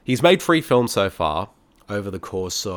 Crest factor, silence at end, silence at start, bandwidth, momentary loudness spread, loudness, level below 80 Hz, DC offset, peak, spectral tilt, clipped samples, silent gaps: 20 dB; 0 s; 0.1 s; 19 kHz; 13 LU; -21 LUFS; -48 dBFS; under 0.1%; -2 dBFS; -4.5 dB/octave; under 0.1%; none